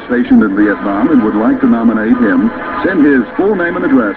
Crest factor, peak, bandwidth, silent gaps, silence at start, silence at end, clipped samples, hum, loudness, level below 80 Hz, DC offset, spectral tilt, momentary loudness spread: 10 dB; 0 dBFS; 4.4 kHz; none; 0 s; 0 s; under 0.1%; none; -11 LUFS; -40 dBFS; under 0.1%; -9 dB/octave; 4 LU